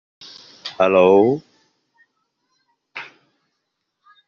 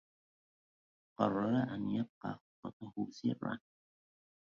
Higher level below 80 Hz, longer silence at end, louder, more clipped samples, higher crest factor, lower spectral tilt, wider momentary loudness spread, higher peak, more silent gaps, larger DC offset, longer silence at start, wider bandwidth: first, -68 dBFS vs -74 dBFS; first, 1.25 s vs 1 s; first, -16 LUFS vs -38 LUFS; neither; second, 18 dB vs 24 dB; second, -4.5 dB/octave vs -6.5 dB/octave; first, 27 LU vs 14 LU; first, -2 dBFS vs -16 dBFS; second, none vs 2.09-2.21 s, 2.41-2.63 s, 2.73-2.80 s; neither; second, 0.65 s vs 1.2 s; about the same, 6.8 kHz vs 7 kHz